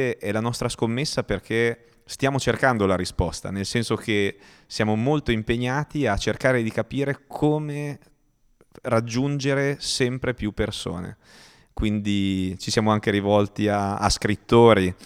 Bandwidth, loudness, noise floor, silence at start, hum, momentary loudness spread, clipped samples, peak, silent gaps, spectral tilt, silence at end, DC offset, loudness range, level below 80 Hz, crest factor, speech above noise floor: 15.5 kHz; -23 LUFS; -62 dBFS; 0 s; none; 8 LU; under 0.1%; -2 dBFS; none; -5.5 dB/octave; 0 s; under 0.1%; 3 LU; -42 dBFS; 20 dB; 39 dB